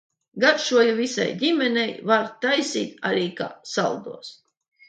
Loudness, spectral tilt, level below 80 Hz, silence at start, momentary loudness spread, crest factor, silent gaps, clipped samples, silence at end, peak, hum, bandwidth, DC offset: -22 LUFS; -3.5 dB/octave; -74 dBFS; 0.35 s; 14 LU; 18 dB; none; under 0.1%; 0.6 s; -6 dBFS; none; 9.2 kHz; under 0.1%